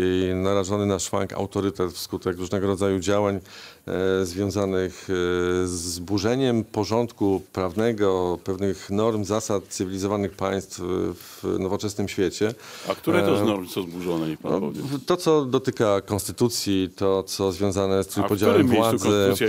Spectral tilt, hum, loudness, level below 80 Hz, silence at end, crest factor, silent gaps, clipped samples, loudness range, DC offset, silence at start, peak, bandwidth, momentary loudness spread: -5.5 dB/octave; none; -24 LUFS; -58 dBFS; 0 s; 20 dB; none; under 0.1%; 3 LU; under 0.1%; 0 s; -4 dBFS; 16 kHz; 8 LU